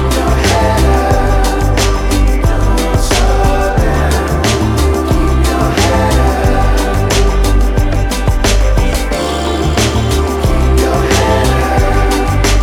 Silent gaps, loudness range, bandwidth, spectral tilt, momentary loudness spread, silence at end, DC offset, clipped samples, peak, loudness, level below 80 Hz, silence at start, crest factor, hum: none; 1 LU; 16.5 kHz; -5 dB/octave; 3 LU; 0 s; under 0.1%; under 0.1%; 0 dBFS; -12 LUFS; -14 dBFS; 0 s; 10 dB; none